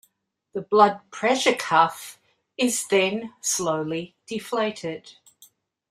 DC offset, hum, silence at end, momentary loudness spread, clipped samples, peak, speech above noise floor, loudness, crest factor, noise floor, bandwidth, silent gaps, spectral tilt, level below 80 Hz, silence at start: under 0.1%; none; 0.8 s; 17 LU; under 0.1%; -4 dBFS; 47 dB; -23 LUFS; 22 dB; -70 dBFS; 16 kHz; none; -3 dB/octave; -70 dBFS; 0.55 s